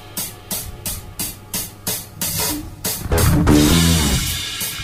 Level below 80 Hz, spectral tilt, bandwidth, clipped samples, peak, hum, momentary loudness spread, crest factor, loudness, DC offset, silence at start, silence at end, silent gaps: -28 dBFS; -4 dB/octave; 16 kHz; under 0.1%; -2 dBFS; none; 13 LU; 16 dB; -19 LUFS; under 0.1%; 0 s; 0 s; none